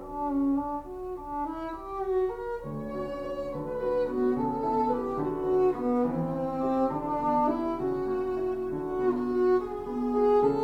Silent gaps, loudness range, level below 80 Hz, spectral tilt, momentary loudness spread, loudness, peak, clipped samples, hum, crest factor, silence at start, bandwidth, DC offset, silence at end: none; 5 LU; -50 dBFS; -9 dB/octave; 9 LU; -29 LUFS; -12 dBFS; under 0.1%; none; 16 dB; 0 s; 6.2 kHz; under 0.1%; 0 s